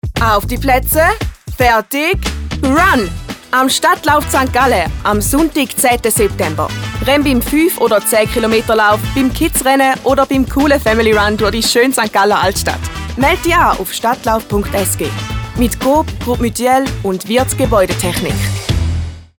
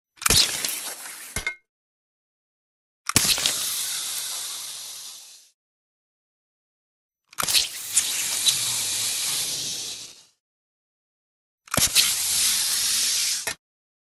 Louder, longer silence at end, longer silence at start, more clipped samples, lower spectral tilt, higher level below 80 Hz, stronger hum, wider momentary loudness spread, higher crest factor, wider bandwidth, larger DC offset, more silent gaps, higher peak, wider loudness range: first, -13 LUFS vs -22 LUFS; second, 0.15 s vs 0.45 s; second, 0.05 s vs 0.2 s; neither; first, -4 dB/octave vs 0.5 dB/octave; first, -26 dBFS vs -50 dBFS; neither; second, 7 LU vs 15 LU; second, 12 dB vs 28 dB; first, over 20 kHz vs 17.5 kHz; neither; second, none vs 1.69-3.05 s, 5.54-7.09 s, 10.40-11.58 s; about the same, 0 dBFS vs 0 dBFS; second, 3 LU vs 8 LU